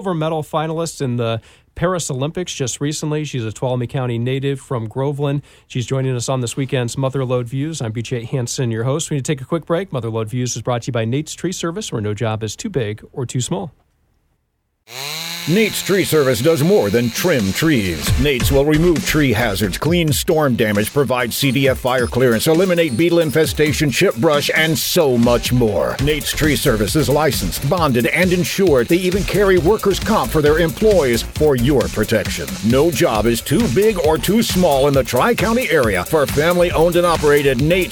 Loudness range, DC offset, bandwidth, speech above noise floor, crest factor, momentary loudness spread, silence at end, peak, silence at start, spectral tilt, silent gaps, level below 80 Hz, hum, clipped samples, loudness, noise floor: 7 LU; under 0.1%; 19 kHz; 51 dB; 14 dB; 8 LU; 0 s; -2 dBFS; 0 s; -5 dB/octave; none; -34 dBFS; none; under 0.1%; -17 LUFS; -68 dBFS